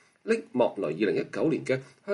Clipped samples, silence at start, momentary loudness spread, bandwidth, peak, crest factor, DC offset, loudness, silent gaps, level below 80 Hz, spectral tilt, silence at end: under 0.1%; 0.25 s; 4 LU; 11 kHz; -10 dBFS; 18 dB; under 0.1%; -28 LUFS; none; -74 dBFS; -6.5 dB/octave; 0 s